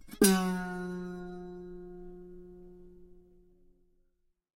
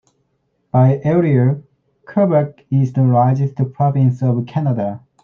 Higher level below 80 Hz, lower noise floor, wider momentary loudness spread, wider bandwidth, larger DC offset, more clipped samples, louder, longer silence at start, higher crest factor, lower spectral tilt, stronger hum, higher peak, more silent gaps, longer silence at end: about the same, -56 dBFS vs -56 dBFS; first, -75 dBFS vs -66 dBFS; first, 27 LU vs 7 LU; first, 16 kHz vs 3.8 kHz; neither; neither; second, -31 LUFS vs -16 LUFS; second, 0 s vs 0.75 s; first, 26 dB vs 14 dB; second, -4.5 dB/octave vs -11 dB/octave; neither; second, -10 dBFS vs -2 dBFS; neither; first, 1.4 s vs 0.25 s